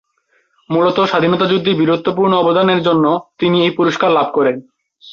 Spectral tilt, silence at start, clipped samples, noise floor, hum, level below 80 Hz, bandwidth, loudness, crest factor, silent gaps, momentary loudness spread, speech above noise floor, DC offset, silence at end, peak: -7 dB/octave; 0.7 s; under 0.1%; -61 dBFS; none; -56 dBFS; 7.2 kHz; -14 LUFS; 12 dB; none; 4 LU; 47 dB; under 0.1%; 0 s; -2 dBFS